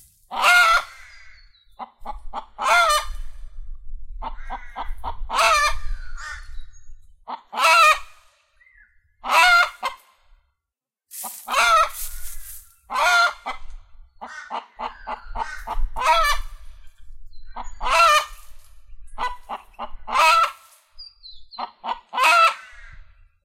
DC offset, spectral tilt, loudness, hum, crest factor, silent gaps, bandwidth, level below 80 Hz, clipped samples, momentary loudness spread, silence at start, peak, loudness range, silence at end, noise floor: under 0.1%; 0 dB/octave; -18 LUFS; none; 20 dB; none; 16 kHz; -36 dBFS; under 0.1%; 24 LU; 0.3 s; -2 dBFS; 6 LU; 0.35 s; -86 dBFS